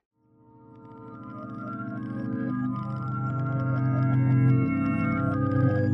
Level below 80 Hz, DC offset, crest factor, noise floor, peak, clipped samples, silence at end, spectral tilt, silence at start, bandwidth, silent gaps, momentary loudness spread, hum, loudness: -54 dBFS; under 0.1%; 14 dB; -57 dBFS; -12 dBFS; under 0.1%; 0 s; -11 dB/octave; 0.7 s; 3.3 kHz; none; 17 LU; none; -27 LUFS